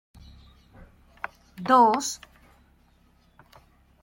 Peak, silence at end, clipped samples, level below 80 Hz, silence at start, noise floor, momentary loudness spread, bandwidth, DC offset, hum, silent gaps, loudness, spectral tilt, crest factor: -6 dBFS; 1.85 s; under 0.1%; -58 dBFS; 1.6 s; -61 dBFS; 21 LU; 16.5 kHz; under 0.1%; none; none; -22 LUFS; -3.5 dB/octave; 22 dB